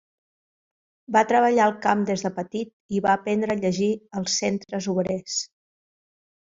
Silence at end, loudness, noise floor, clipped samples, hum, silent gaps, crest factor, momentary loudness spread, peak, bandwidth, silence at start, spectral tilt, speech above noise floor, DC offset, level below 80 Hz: 1.05 s; -24 LUFS; under -90 dBFS; under 0.1%; none; 2.73-2.89 s; 20 dB; 10 LU; -4 dBFS; 7.8 kHz; 1.1 s; -4.5 dB/octave; over 67 dB; under 0.1%; -64 dBFS